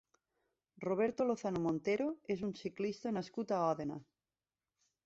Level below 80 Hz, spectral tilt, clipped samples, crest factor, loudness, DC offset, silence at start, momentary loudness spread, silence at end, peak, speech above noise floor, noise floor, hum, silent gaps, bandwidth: -74 dBFS; -6 dB/octave; under 0.1%; 18 dB; -38 LUFS; under 0.1%; 0.8 s; 7 LU; 1.05 s; -22 dBFS; over 53 dB; under -90 dBFS; none; none; 8 kHz